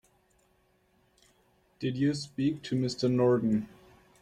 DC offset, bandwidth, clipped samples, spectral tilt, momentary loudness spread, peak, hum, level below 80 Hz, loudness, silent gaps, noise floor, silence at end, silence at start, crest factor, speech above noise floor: under 0.1%; 11 kHz; under 0.1%; -7 dB/octave; 10 LU; -14 dBFS; none; -66 dBFS; -29 LUFS; none; -69 dBFS; 0.55 s; 1.8 s; 18 dB; 41 dB